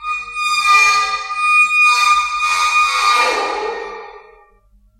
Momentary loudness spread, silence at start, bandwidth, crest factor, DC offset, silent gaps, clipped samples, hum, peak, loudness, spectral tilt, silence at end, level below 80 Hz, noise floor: 13 LU; 0 s; 14 kHz; 16 dB; under 0.1%; none; under 0.1%; none; 0 dBFS; -13 LUFS; 1.5 dB/octave; 0.8 s; -52 dBFS; -52 dBFS